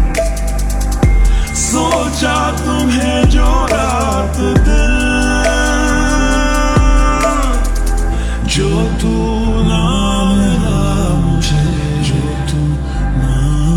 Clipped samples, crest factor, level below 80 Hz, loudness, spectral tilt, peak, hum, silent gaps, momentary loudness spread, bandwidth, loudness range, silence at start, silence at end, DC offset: under 0.1%; 12 dB; -16 dBFS; -14 LUFS; -5 dB/octave; 0 dBFS; none; none; 5 LU; 12.5 kHz; 2 LU; 0 s; 0 s; under 0.1%